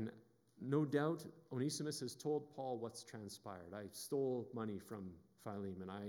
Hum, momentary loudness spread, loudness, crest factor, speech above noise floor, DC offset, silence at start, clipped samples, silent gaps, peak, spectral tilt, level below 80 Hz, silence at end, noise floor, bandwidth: none; 13 LU; -44 LUFS; 20 dB; 22 dB; under 0.1%; 0 s; under 0.1%; none; -24 dBFS; -5.5 dB/octave; -88 dBFS; 0 s; -66 dBFS; over 20 kHz